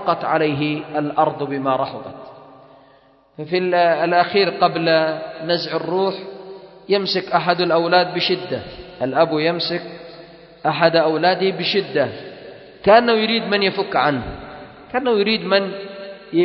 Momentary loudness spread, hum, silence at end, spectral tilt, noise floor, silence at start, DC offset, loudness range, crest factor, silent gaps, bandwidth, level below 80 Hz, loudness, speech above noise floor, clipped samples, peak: 19 LU; none; 0 s; -7 dB/octave; -52 dBFS; 0 s; under 0.1%; 3 LU; 18 dB; none; 6 kHz; -54 dBFS; -18 LUFS; 34 dB; under 0.1%; 0 dBFS